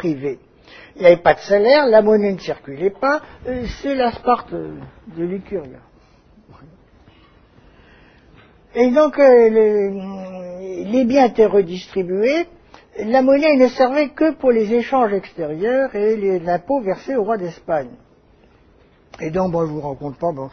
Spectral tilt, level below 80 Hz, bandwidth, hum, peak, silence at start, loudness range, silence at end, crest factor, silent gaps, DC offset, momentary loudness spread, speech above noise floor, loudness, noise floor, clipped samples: -7 dB/octave; -48 dBFS; 6.6 kHz; none; 0 dBFS; 0 s; 9 LU; 0 s; 18 dB; none; under 0.1%; 16 LU; 35 dB; -17 LUFS; -52 dBFS; under 0.1%